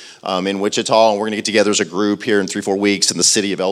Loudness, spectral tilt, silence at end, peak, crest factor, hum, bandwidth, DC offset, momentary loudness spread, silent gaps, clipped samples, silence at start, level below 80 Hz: -16 LUFS; -2.5 dB/octave; 0 s; 0 dBFS; 16 dB; none; 14.5 kHz; under 0.1%; 6 LU; none; under 0.1%; 0 s; -70 dBFS